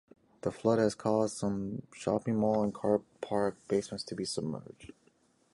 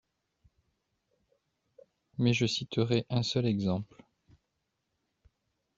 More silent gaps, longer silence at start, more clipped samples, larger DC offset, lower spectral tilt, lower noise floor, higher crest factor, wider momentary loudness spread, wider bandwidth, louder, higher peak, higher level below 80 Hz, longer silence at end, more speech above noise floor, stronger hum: neither; second, 0.45 s vs 2.2 s; neither; neither; about the same, -6 dB/octave vs -5.5 dB/octave; second, -69 dBFS vs -82 dBFS; about the same, 18 dB vs 22 dB; about the same, 10 LU vs 9 LU; first, 11.5 kHz vs 7.8 kHz; about the same, -32 LUFS vs -30 LUFS; about the same, -14 dBFS vs -12 dBFS; about the same, -64 dBFS vs -66 dBFS; second, 0.65 s vs 1.95 s; second, 37 dB vs 52 dB; neither